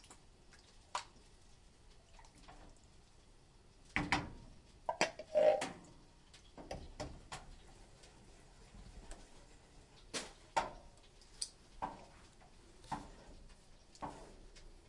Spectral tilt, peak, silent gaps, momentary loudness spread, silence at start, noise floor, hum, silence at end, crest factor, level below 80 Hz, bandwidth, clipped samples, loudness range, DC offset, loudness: -3.5 dB/octave; -14 dBFS; none; 25 LU; 0 s; -63 dBFS; none; 0.05 s; 30 dB; -60 dBFS; 11.5 kHz; under 0.1%; 16 LU; under 0.1%; -41 LUFS